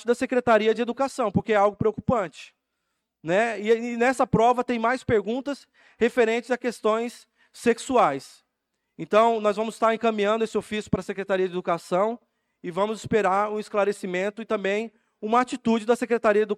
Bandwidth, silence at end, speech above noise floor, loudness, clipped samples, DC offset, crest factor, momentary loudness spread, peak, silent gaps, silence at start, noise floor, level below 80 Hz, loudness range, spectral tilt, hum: 13 kHz; 0 s; 55 dB; -24 LUFS; under 0.1%; under 0.1%; 16 dB; 8 LU; -8 dBFS; none; 0 s; -79 dBFS; -58 dBFS; 2 LU; -5.5 dB/octave; none